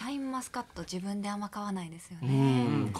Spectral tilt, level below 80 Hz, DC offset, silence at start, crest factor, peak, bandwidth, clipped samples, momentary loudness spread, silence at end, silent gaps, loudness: -6.5 dB/octave; -64 dBFS; under 0.1%; 0 s; 16 dB; -16 dBFS; 13.5 kHz; under 0.1%; 13 LU; 0 s; none; -32 LUFS